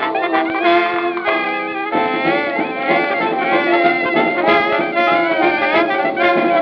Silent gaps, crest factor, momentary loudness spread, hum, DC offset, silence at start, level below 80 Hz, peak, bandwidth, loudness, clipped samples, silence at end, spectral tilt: none; 14 dB; 4 LU; none; under 0.1%; 0 s; -62 dBFS; -2 dBFS; 6 kHz; -15 LUFS; under 0.1%; 0 s; -7 dB/octave